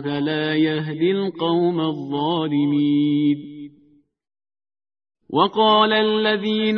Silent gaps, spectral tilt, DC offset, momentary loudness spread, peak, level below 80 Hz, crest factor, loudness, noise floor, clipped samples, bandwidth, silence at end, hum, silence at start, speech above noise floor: none; -8.5 dB/octave; under 0.1%; 9 LU; -4 dBFS; -66 dBFS; 18 dB; -20 LUFS; -57 dBFS; under 0.1%; 5.4 kHz; 0 s; none; 0 s; 38 dB